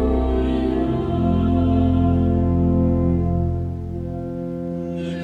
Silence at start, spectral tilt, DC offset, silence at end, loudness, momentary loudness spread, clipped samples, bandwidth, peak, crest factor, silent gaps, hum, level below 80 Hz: 0 s; -10.5 dB/octave; under 0.1%; 0 s; -21 LUFS; 10 LU; under 0.1%; 4.5 kHz; -8 dBFS; 12 dB; none; none; -28 dBFS